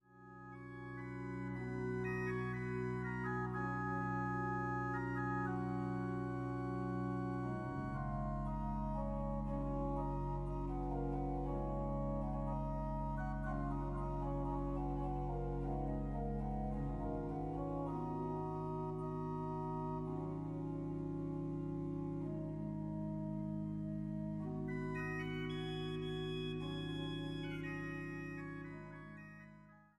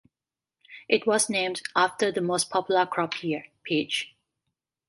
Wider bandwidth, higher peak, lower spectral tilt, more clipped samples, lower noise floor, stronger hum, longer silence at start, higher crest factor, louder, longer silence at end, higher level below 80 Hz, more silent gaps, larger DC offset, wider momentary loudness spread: second, 10.5 kHz vs 12 kHz; second, -28 dBFS vs -6 dBFS; first, -8.5 dB/octave vs -3 dB/octave; neither; second, -61 dBFS vs under -90 dBFS; neither; second, 0.1 s vs 0.7 s; second, 12 dB vs 22 dB; second, -42 LUFS vs -26 LUFS; second, 0.15 s vs 0.8 s; first, -50 dBFS vs -74 dBFS; neither; neither; second, 5 LU vs 8 LU